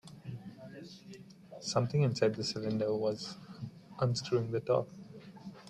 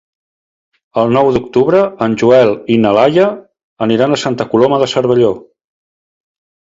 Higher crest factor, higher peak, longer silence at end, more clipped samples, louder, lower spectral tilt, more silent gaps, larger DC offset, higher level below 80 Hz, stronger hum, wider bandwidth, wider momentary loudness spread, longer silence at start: first, 20 dB vs 12 dB; second, -16 dBFS vs 0 dBFS; second, 0 s vs 1.35 s; neither; second, -33 LUFS vs -12 LUFS; about the same, -6 dB/octave vs -6.5 dB/octave; second, none vs 3.64-3.77 s; neither; second, -70 dBFS vs -50 dBFS; neither; first, 11.5 kHz vs 7.8 kHz; first, 20 LU vs 6 LU; second, 0.05 s vs 0.95 s